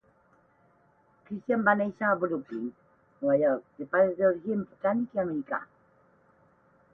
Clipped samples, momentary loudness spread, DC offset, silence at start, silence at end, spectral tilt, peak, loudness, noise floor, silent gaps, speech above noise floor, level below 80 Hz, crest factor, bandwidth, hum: under 0.1%; 12 LU; under 0.1%; 1.3 s; 1.3 s; -10 dB/octave; -8 dBFS; -28 LUFS; -65 dBFS; none; 37 dB; -72 dBFS; 22 dB; 3.7 kHz; none